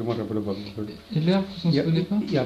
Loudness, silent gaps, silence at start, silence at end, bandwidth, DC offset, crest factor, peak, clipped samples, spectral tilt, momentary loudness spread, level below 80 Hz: -25 LUFS; none; 0 s; 0 s; 8.4 kHz; under 0.1%; 16 dB; -8 dBFS; under 0.1%; -8 dB/octave; 9 LU; -56 dBFS